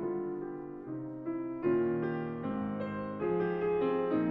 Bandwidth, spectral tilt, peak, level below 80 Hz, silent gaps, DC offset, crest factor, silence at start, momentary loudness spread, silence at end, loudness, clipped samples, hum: 4.6 kHz; -10.5 dB/octave; -20 dBFS; -64 dBFS; none; under 0.1%; 14 dB; 0 s; 10 LU; 0 s; -34 LUFS; under 0.1%; none